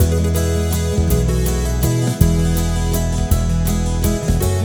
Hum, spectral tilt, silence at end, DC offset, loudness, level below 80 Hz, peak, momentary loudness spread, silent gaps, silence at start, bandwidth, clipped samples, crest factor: none; -6 dB/octave; 0 s; under 0.1%; -18 LUFS; -20 dBFS; 0 dBFS; 3 LU; none; 0 s; over 20 kHz; under 0.1%; 16 dB